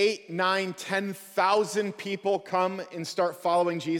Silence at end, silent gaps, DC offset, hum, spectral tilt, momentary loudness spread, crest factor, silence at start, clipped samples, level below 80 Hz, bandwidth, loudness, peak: 0 s; none; under 0.1%; none; -4.5 dB/octave; 7 LU; 16 dB; 0 s; under 0.1%; -76 dBFS; 18.5 kHz; -28 LUFS; -12 dBFS